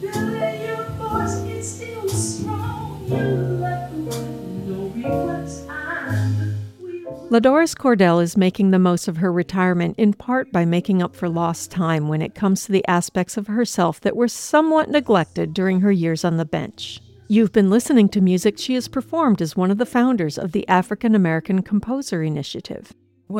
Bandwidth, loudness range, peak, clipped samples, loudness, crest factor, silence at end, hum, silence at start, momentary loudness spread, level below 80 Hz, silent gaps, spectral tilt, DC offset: 16 kHz; 7 LU; -2 dBFS; under 0.1%; -20 LUFS; 18 dB; 0 s; none; 0 s; 12 LU; -50 dBFS; none; -6 dB/octave; under 0.1%